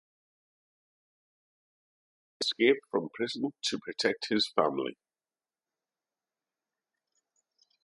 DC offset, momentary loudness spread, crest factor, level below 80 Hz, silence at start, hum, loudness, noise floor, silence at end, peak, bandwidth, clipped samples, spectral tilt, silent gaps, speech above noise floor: under 0.1%; 9 LU; 26 dB; -80 dBFS; 2.4 s; none; -30 LUFS; under -90 dBFS; 2.9 s; -10 dBFS; 11.5 kHz; under 0.1%; -3.5 dB/octave; none; over 60 dB